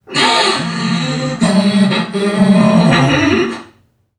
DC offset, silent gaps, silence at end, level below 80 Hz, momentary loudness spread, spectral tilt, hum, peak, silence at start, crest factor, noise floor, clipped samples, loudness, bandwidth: under 0.1%; none; 0.55 s; -44 dBFS; 7 LU; -5 dB/octave; none; 0 dBFS; 0.1 s; 12 dB; -51 dBFS; under 0.1%; -12 LUFS; 11 kHz